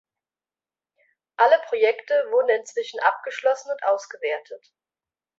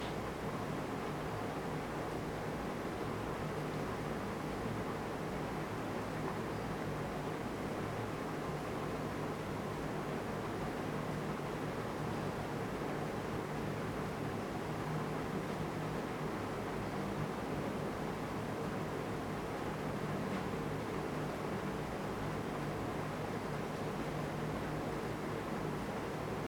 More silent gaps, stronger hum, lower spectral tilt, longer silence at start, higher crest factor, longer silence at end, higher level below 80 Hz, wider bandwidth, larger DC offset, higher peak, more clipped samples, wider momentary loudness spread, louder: neither; neither; second, 0 dB/octave vs -6 dB/octave; first, 1.4 s vs 0 s; first, 20 dB vs 14 dB; first, 0.8 s vs 0 s; second, -82 dBFS vs -56 dBFS; second, 8 kHz vs 19 kHz; neither; first, -4 dBFS vs -26 dBFS; neither; first, 11 LU vs 1 LU; first, -22 LUFS vs -40 LUFS